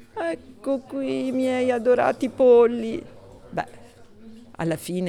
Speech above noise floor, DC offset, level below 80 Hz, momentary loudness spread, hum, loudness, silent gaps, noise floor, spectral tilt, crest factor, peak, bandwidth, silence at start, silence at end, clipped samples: 25 dB; under 0.1%; -58 dBFS; 15 LU; none; -23 LUFS; none; -46 dBFS; -6.5 dB/octave; 16 dB; -6 dBFS; 13.5 kHz; 0 s; 0 s; under 0.1%